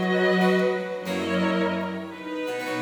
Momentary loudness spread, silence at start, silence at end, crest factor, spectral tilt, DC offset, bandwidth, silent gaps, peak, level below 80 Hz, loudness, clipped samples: 11 LU; 0 s; 0 s; 14 dB; -6 dB/octave; under 0.1%; 19 kHz; none; -10 dBFS; -70 dBFS; -25 LUFS; under 0.1%